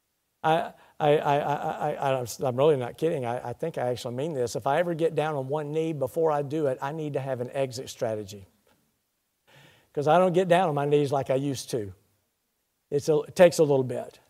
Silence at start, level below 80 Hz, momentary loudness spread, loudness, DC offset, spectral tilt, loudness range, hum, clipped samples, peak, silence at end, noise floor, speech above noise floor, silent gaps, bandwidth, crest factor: 0.45 s; -68 dBFS; 11 LU; -26 LUFS; under 0.1%; -6 dB/octave; 5 LU; none; under 0.1%; -4 dBFS; 0.2 s; -76 dBFS; 51 dB; none; 16 kHz; 22 dB